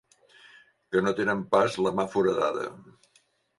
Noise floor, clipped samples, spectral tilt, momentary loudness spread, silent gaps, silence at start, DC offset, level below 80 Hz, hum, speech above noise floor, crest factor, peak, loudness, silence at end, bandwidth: -67 dBFS; under 0.1%; -5.5 dB/octave; 5 LU; none; 0.9 s; under 0.1%; -64 dBFS; none; 41 dB; 20 dB; -8 dBFS; -26 LUFS; 0.75 s; 11.5 kHz